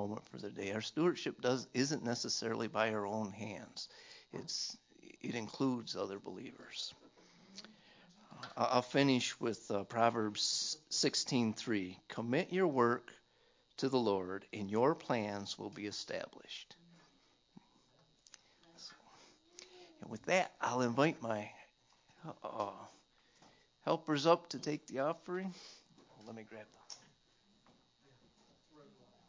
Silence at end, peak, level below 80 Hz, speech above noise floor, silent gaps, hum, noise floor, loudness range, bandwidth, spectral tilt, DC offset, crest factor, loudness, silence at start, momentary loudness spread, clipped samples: 0.45 s; -14 dBFS; -78 dBFS; 34 dB; none; none; -72 dBFS; 13 LU; 7.8 kHz; -4 dB/octave; under 0.1%; 24 dB; -37 LUFS; 0 s; 21 LU; under 0.1%